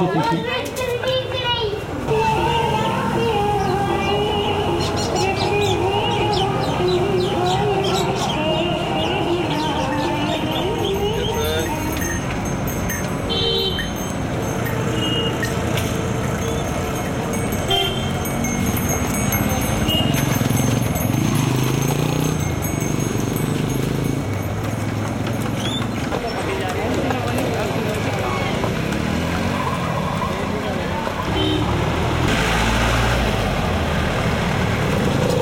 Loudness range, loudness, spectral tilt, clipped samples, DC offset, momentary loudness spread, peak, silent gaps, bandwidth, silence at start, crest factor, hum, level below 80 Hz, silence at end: 3 LU; -20 LUFS; -5 dB/octave; under 0.1%; under 0.1%; 5 LU; -6 dBFS; none; 17 kHz; 0 s; 14 dB; none; -34 dBFS; 0 s